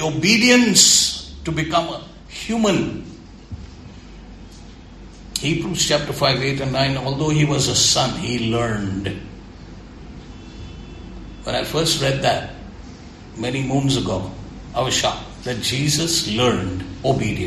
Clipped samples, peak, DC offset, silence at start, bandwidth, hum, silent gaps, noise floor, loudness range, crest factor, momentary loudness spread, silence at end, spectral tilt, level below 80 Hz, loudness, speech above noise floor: under 0.1%; 0 dBFS; under 0.1%; 0 s; 14 kHz; none; none; -40 dBFS; 9 LU; 20 dB; 24 LU; 0 s; -3.5 dB/octave; -40 dBFS; -18 LUFS; 21 dB